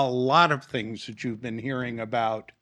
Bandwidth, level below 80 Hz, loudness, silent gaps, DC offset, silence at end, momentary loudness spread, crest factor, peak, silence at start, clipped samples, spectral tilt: 11 kHz; -68 dBFS; -26 LUFS; none; under 0.1%; 0.2 s; 13 LU; 22 dB; -4 dBFS; 0 s; under 0.1%; -6 dB/octave